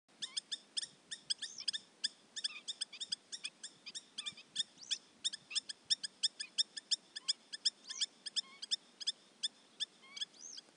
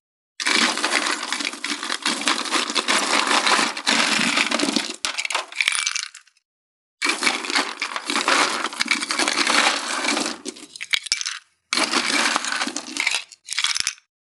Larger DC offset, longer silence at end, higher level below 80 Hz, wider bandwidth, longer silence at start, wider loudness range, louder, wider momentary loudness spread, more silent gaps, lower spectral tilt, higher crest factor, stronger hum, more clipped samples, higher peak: neither; second, 0.15 s vs 0.4 s; second, under -90 dBFS vs -84 dBFS; second, 11.5 kHz vs 13 kHz; second, 0.2 s vs 0.4 s; about the same, 5 LU vs 3 LU; second, -40 LUFS vs -20 LUFS; about the same, 8 LU vs 8 LU; second, none vs 6.45-6.98 s; second, 2.5 dB/octave vs 0 dB/octave; about the same, 26 dB vs 22 dB; neither; neither; second, -18 dBFS vs 0 dBFS